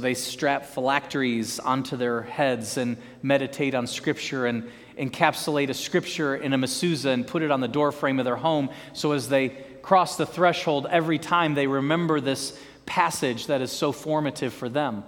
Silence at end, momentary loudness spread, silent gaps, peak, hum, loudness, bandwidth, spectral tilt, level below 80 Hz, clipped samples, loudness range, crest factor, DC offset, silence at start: 0 s; 7 LU; none; -2 dBFS; none; -25 LUFS; 18.5 kHz; -4.5 dB/octave; -64 dBFS; under 0.1%; 3 LU; 22 dB; under 0.1%; 0 s